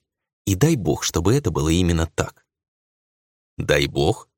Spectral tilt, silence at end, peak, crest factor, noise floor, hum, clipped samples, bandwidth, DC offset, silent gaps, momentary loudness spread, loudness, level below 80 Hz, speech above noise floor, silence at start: -5 dB/octave; 0.15 s; -2 dBFS; 20 dB; under -90 dBFS; none; under 0.1%; 17 kHz; under 0.1%; 2.68-3.57 s; 9 LU; -21 LUFS; -36 dBFS; over 70 dB; 0.45 s